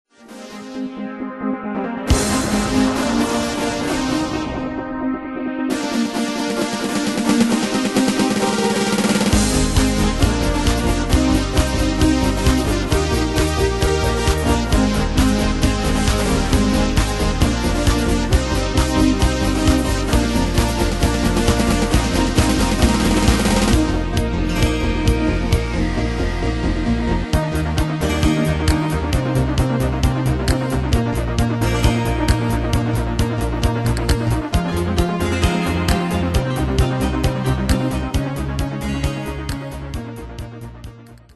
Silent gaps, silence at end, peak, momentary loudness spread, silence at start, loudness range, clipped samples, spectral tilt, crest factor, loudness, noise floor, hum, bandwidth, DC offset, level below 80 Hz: none; 0.2 s; -2 dBFS; 7 LU; 0.25 s; 4 LU; under 0.1%; -5 dB/octave; 16 dB; -19 LUFS; -38 dBFS; none; 12.5 kHz; under 0.1%; -24 dBFS